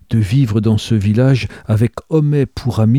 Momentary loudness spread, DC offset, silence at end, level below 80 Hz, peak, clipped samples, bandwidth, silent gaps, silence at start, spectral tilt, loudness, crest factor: 4 LU; 0.2%; 0 s; -40 dBFS; -2 dBFS; under 0.1%; 12 kHz; none; 0.1 s; -8 dB/octave; -15 LUFS; 12 dB